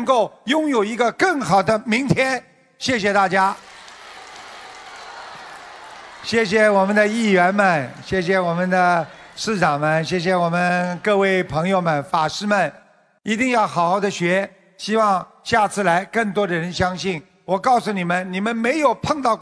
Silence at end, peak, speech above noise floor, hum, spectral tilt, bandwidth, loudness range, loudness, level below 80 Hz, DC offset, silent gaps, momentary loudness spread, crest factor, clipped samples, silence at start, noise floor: 0 s; -2 dBFS; 22 dB; none; -5 dB/octave; 11 kHz; 5 LU; -19 LUFS; -54 dBFS; under 0.1%; none; 20 LU; 18 dB; under 0.1%; 0 s; -40 dBFS